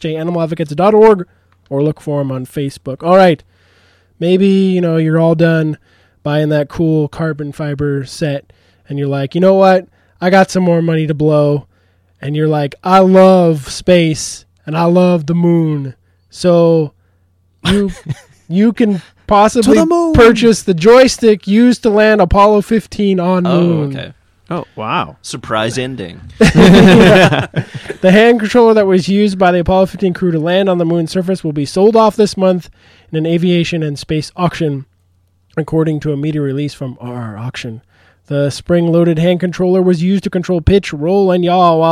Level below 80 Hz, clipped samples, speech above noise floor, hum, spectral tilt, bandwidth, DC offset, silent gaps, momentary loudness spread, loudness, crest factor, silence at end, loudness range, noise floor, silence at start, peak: -34 dBFS; under 0.1%; 44 dB; none; -6.5 dB/octave; 13.5 kHz; under 0.1%; none; 15 LU; -12 LUFS; 12 dB; 0 s; 8 LU; -55 dBFS; 0 s; 0 dBFS